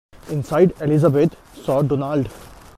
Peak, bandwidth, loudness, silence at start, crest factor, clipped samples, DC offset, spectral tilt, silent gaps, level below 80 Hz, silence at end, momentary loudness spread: -2 dBFS; 14.5 kHz; -19 LUFS; 0.25 s; 16 dB; under 0.1%; under 0.1%; -8.5 dB/octave; none; -46 dBFS; 0.3 s; 12 LU